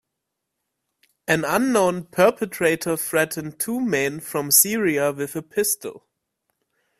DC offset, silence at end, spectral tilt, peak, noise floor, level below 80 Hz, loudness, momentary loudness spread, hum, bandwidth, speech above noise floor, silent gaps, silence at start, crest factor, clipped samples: under 0.1%; 1 s; -3 dB/octave; 0 dBFS; -81 dBFS; -62 dBFS; -21 LUFS; 11 LU; none; 16 kHz; 59 dB; none; 1.3 s; 22 dB; under 0.1%